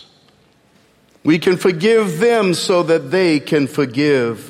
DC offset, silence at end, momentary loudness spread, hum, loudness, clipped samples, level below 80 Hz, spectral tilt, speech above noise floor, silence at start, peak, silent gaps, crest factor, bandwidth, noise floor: under 0.1%; 0 s; 3 LU; none; -15 LUFS; under 0.1%; -60 dBFS; -5.5 dB/octave; 39 dB; 1.25 s; 0 dBFS; none; 16 dB; 16 kHz; -54 dBFS